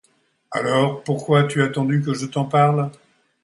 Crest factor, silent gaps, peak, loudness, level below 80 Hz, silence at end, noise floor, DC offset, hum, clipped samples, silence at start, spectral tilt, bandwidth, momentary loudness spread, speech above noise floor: 16 dB; none; -4 dBFS; -20 LUFS; -64 dBFS; 0.5 s; -61 dBFS; under 0.1%; none; under 0.1%; 0.5 s; -6.5 dB/octave; 11.5 kHz; 8 LU; 42 dB